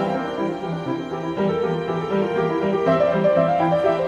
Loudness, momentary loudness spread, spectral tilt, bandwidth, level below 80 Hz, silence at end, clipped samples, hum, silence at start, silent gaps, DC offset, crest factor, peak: -21 LUFS; 9 LU; -8 dB/octave; 9.2 kHz; -54 dBFS; 0 s; under 0.1%; none; 0 s; none; under 0.1%; 16 dB; -6 dBFS